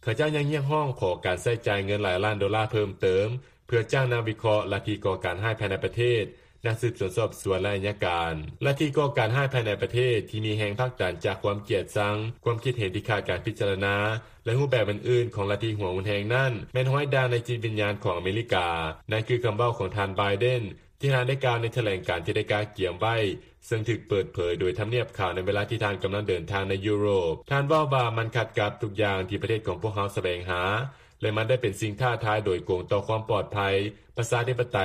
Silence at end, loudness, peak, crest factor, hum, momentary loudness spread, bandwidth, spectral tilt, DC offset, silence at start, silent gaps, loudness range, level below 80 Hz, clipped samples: 0 s; -27 LUFS; -10 dBFS; 16 dB; none; 5 LU; 14.5 kHz; -6 dB/octave; under 0.1%; 0.05 s; none; 2 LU; -54 dBFS; under 0.1%